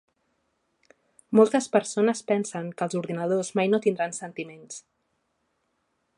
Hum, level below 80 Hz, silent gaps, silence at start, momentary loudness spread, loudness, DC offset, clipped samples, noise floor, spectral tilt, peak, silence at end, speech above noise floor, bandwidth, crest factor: none; -78 dBFS; none; 1.3 s; 17 LU; -25 LUFS; under 0.1%; under 0.1%; -75 dBFS; -5.5 dB/octave; -6 dBFS; 1.4 s; 50 dB; 11 kHz; 22 dB